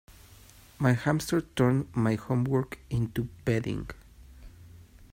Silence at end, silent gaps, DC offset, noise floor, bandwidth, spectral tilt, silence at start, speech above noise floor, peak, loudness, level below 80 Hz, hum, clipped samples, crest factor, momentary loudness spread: 0.1 s; none; under 0.1%; -53 dBFS; 16 kHz; -7 dB/octave; 0.1 s; 26 dB; -10 dBFS; -29 LUFS; -52 dBFS; none; under 0.1%; 20 dB; 7 LU